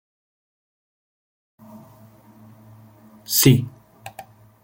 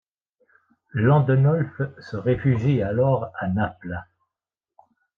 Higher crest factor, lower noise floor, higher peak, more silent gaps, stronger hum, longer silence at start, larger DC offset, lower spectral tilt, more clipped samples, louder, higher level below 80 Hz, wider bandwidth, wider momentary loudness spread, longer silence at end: first, 24 dB vs 16 dB; second, -49 dBFS vs -88 dBFS; first, -2 dBFS vs -6 dBFS; neither; neither; first, 3.3 s vs 0.95 s; neither; second, -4.5 dB/octave vs -10 dB/octave; neither; first, -17 LUFS vs -22 LUFS; about the same, -58 dBFS vs -54 dBFS; first, 17 kHz vs 4.9 kHz; first, 28 LU vs 14 LU; second, 0.45 s vs 1.15 s